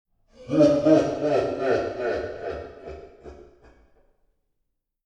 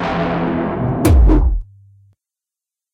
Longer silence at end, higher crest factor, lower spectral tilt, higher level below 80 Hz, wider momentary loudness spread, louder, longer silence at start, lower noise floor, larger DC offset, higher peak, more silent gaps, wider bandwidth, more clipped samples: first, 1.65 s vs 1.3 s; first, 20 dB vs 14 dB; about the same, -7 dB/octave vs -7.5 dB/octave; second, -52 dBFS vs -18 dBFS; first, 22 LU vs 8 LU; second, -23 LUFS vs -16 LUFS; first, 0.4 s vs 0 s; second, -77 dBFS vs -87 dBFS; neither; second, -6 dBFS vs -2 dBFS; neither; second, 8.8 kHz vs 16 kHz; neither